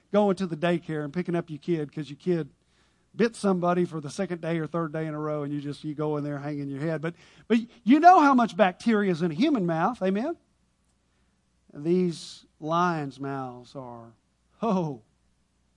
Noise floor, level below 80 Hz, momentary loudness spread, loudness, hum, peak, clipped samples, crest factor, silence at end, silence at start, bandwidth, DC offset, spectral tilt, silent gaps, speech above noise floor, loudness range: -69 dBFS; -68 dBFS; 14 LU; -26 LUFS; none; -4 dBFS; under 0.1%; 22 dB; 0.8 s; 0.15 s; 11 kHz; under 0.1%; -7 dB/octave; none; 43 dB; 9 LU